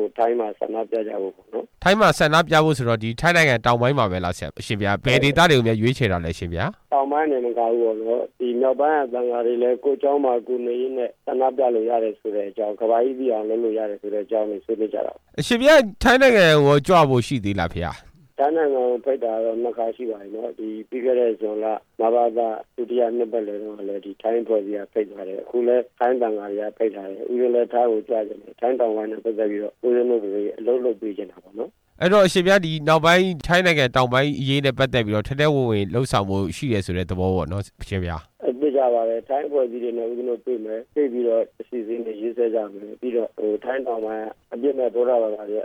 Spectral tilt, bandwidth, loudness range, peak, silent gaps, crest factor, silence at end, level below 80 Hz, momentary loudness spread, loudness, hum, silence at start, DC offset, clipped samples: -5.5 dB/octave; 17 kHz; 7 LU; -6 dBFS; none; 14 dB; 0 s; -48 dBFS; 13 LU; -21 LUFS; none; 0 s; under 0.1%; under 0.1%